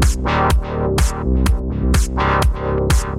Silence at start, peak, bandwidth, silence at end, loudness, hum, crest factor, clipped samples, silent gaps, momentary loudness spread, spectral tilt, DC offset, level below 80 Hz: 0 s; -2 dBFS; 15 kHz; 0 s; -18 LUFS; none; 14 dB; under 0.1%; none; 3 LU; -5.5 dB/octave; under 0.1%; -18 dBFS